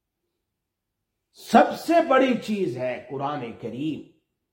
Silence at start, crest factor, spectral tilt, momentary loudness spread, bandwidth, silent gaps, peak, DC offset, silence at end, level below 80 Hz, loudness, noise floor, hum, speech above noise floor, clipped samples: 1.4 s; 22 dB; -5.5 dB/octave; 13 LU; 16.5 kHz; none; -4 dBFS; under 0.1%; 0.5 s; -68 dBFS; -23 LUFS; -82 dBFS; none; 59 dB; under 0.1%